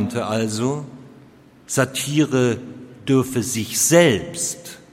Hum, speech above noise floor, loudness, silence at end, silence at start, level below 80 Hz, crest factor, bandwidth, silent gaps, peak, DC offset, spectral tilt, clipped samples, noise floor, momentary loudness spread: none; 28 dB; -20 LUFS; 0.15 s; 0 s; -56 dBFS; 20 dB; 16.5 kHz; none; 0 dBFS; under 0.1%; -4 dB/octave; under 0.1%; -48 dBFS; 15 LU